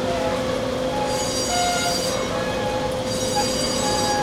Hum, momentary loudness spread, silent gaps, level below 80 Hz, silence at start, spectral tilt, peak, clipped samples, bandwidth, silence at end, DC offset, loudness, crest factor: none; 4 LU; none; -42 dBFS; 0 s; -3 dB/octave; -8 dBFS; under 0.1%; 16 kHz; 0 s; under 0.1%; -22 LUFS; 14 dB